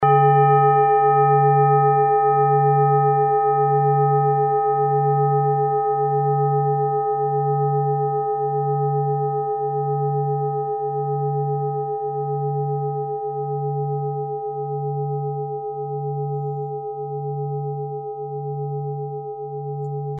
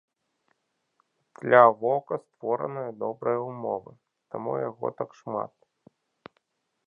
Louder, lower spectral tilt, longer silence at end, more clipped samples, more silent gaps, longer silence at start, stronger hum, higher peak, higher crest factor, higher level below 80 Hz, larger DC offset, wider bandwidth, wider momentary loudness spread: first, -21 LUFS vs -26 LUFS; first, -13 dB/octave vs -8 dB/octave; second, 0 s vs 1.4 s; neither; neither; second, 0 s vs 1.4 s; neither; second, -6 dBFS vs -2 dBFS; second, 14 dB vs 26 dB; first, -70 dBFS vs -78 dBFS; neither; second, 3.2 kHz vs 6.6 kHz; second, 12 LU vs 18 LU